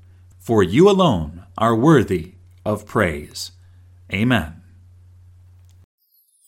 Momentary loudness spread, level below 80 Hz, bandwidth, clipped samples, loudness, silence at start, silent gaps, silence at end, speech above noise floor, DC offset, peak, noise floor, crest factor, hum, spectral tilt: 18 LU; -44 dBFS; 16.5 kHz; under 0.1%; -18 LUFS; 0.45 s; none; 1.95 s; 31 dB; under 0.1%; -2 dBFS; -47 dBFS; 20 dB; none; -6.5 dB/octave